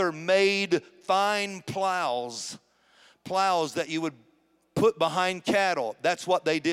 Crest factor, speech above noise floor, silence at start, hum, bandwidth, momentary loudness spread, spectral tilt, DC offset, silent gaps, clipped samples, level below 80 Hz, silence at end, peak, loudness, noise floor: 16 dB; 40 dB; 0 s; none; 15.5 kHz; 10 LU; -4 dB/octave; under 0.1%; none; under 0.1%; -70 dBFS; 0 s; -10 dBFS; -26 LUFS; -66 dBFS